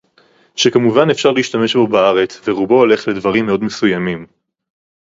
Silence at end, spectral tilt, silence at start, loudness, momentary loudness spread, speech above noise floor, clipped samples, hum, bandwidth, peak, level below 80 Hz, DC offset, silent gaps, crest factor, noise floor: 0.8 s; -5 dB/octave; 0.55 s; -14 LUFS; 7 LU; 39 dB; under 0.1%; none; 7.8 kHz; 0 dBFS; -54 dBFS; under 0.1%; none; 14 dB; -53 dBFS